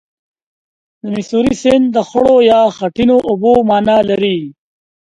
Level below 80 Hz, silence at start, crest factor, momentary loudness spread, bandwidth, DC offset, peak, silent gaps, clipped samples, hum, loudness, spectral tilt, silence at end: -44 dBFS; 1.05 s; 12 dB; 12 LU; 10.5 kHz; under 0.1%; 0 dBFS; none; under 0.1%; none; -12 LUFS; -6 dB/octave; 0.65 s